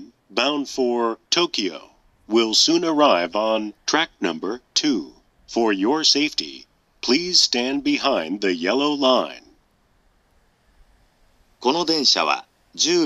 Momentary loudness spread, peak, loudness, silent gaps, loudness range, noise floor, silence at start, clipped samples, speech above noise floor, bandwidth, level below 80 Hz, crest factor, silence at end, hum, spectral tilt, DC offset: 11 LU; -2 dBFS; -20 LUFS; none; 5 LU; -61 dBFS; 0 s; under 0.1%; 41 dB; 12.5 kHz; -62 dBFS; 20 dB; 0 s; none; -2 dB/octave; under 0.1%